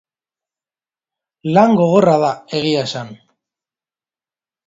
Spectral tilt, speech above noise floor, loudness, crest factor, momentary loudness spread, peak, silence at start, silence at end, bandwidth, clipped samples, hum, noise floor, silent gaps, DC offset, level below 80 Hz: -6.5 dB/octave; over 76 dB; -15 LUFS; 18 dB; 16 LU; 0 dBFS; 1.45 s; 1.5 s; 7.8 kHz; under 0.1%; none; under -90 dBFS; none; under 0.1%; -60 dBFS